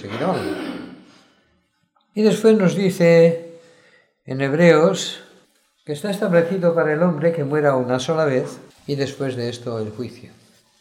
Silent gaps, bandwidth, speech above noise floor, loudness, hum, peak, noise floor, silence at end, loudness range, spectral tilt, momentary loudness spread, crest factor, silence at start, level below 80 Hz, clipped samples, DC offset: none; 15.5 kHz; 47 dB; -19 LUFS; none; 0 dBFS; -65 dBFS; 0.65 s; 4 LU; -6.5 dB/octave; 17 LU; 20 dB; 0 s; -68 dBFS; under 0.1%; under 0.1%